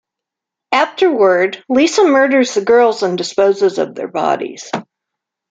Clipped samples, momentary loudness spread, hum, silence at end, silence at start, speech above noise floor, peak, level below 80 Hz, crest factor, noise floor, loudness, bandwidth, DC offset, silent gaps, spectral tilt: under 0.1%; 10 LU; none; 0.7 s; 0.7 s; 70 dB; -2 dBFS; -62 dBFS; 14 dB; -83 dBFS; -14 LUFS; 9 kHz; under 0.1%; none; -4 dB/octave